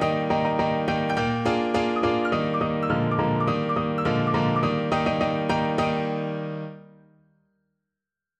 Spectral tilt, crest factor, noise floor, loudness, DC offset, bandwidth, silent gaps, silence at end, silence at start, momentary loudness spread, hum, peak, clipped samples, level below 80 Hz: -7 dB/octave; 16 dB; -88 dBFS; -24 LUFS; under 0.1%; 9.6 kHz; none; 1.55 s; 0 s; 4 LU; none; -10 dBFS; under 0.1%; -50 dBFS